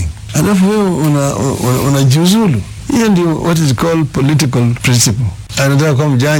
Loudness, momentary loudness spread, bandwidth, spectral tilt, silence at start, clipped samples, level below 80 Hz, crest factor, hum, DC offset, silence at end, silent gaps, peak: -12 LUFS; 5 LU; 18 kHz; -5.5 dB/octave; 0 s; under 0.1%; -34 dBFS; 12 dB; none; under 0.1%; 0 s; none; 0 dBFS